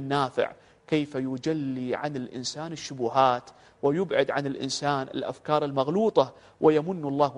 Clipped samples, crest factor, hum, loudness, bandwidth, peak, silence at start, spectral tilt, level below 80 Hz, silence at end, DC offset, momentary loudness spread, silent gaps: under 0.1%; 20 dB; none; -27 LUFS; 10.5 kHz; -6 dBFS; 0 s; -5.5 dB/octave; -66 dBFS; 0 s; under 0.1%; 10 LU; none